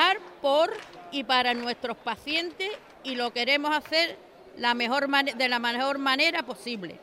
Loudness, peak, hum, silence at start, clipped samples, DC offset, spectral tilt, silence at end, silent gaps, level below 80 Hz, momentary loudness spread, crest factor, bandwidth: -26 LUFS; -8 dBFS; none; 0 s; under 0.1%; under 0.1%; -2.5 dB/octave; 0 s; none; -70 dBFS; 11 LU; 20 dB; 16 kHz